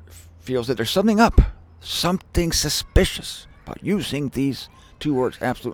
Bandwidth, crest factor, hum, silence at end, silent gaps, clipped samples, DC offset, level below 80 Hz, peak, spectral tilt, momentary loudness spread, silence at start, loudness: 19.5 kHz; 20 dB; none; 0 s; none; under 0.1%; under 0.1%; -28 dBFS; -2 dBFS; -4.5 dB/octave; 17 LU; 0.1 s; -22 LUFS